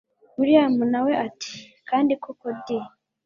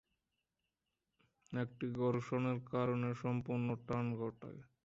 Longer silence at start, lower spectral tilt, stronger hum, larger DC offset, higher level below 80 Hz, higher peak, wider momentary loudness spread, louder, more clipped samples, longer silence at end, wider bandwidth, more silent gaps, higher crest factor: second, 0.4 s vs 1.5 s; second, -5.5 dB/octave vs -8 dB/octave; neither; neither; about the same, -70 dBFS vs -72 dBFS; first, -4 dBFS vs -24 dBFS; first, 18 LU vs 8 LU; first, -23 LUFS vs -39 LUFS; neither; first, 0.4 s vs 0.25 s; about the same, 7.4 kHz vs 7.6 kHz; neither; about the same, 20 dB vs 16 dB